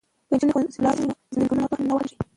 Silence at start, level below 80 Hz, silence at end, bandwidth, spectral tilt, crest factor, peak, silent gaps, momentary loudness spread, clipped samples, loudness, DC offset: 0.3 s; -54 dBFS; 0.15 s; 11 kHz; -7 dB/octave; 14 dB; -8 dBFS; none; 5 LU; under 0.1%; -24 LUFS; under 0.1%